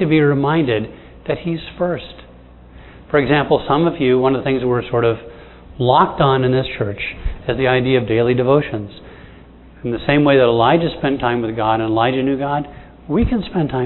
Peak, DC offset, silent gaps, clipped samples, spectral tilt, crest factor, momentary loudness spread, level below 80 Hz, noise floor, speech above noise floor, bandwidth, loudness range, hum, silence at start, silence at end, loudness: 0 dBFS; under 0.1%; none; under 0.1%; -10.5 dB/octave; 18 dB; 11 LU; -36 dBFS; -42 dBFS; 25 dB; 4.2 kHz; 3 LU; none; 0 s; 0 s; -17 LUFS